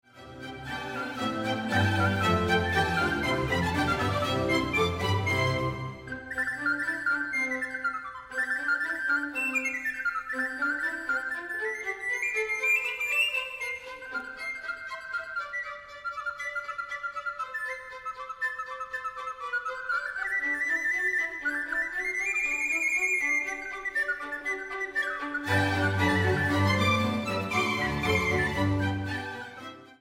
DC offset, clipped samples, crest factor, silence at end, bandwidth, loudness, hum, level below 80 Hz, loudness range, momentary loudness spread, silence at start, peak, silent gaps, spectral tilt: under 0.1%; under 0.1%; 18 dB; 0.05 s; 16 kHz; -28 LUFS; none; -52 dBFS; 8 LU; 11 LU; 0.15 s; -12 dBFS; none; -5 dB/octave